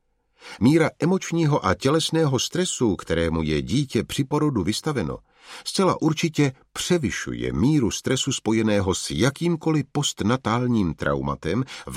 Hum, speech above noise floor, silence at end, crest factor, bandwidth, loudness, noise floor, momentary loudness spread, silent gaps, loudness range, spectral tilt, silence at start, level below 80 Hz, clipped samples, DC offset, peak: none; 27 dB; 0 s; 18 dB; 15.5 kHz; -23 LUFS; -49 dBFS; 6 LU; none; 2 LU; -5 dB/octave; 0.45 s; -44 dBFS; under 0.1%; under 0.1%; -4 dBFS